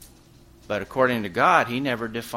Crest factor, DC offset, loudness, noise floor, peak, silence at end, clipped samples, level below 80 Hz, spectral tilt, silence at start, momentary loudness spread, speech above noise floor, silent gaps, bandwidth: 22 dB; under 0.1%; -23 LUFS; -51 dBFS; -4 dBFS; 0 s; under 0.1%; -54 dBFS; -5 dB/octave; 0 s; 11 LU; 29 dB; none; 16.5 kHz